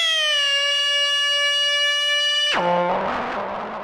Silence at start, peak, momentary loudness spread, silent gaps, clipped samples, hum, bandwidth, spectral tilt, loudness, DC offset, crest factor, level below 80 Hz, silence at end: 0 s; -10 dBFS; 8 LU; none; under 0.1%; none; 17.5 kHz; -1 dB/octave; -18 LUFS; under 0.1%; 10 dB; -58 dBFS; 0 s